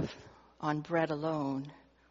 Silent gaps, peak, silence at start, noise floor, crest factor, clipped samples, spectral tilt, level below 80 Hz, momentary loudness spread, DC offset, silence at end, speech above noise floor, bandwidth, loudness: none; -16 dBFS; 0 s; -55 dBFS; 20 dB; under 0.1%; -5.5 dB/octave; -68 dBFS; 13 LU; under 0.1%; 0.3 s; 22 dB; 7.4 kHz; -35 LUFS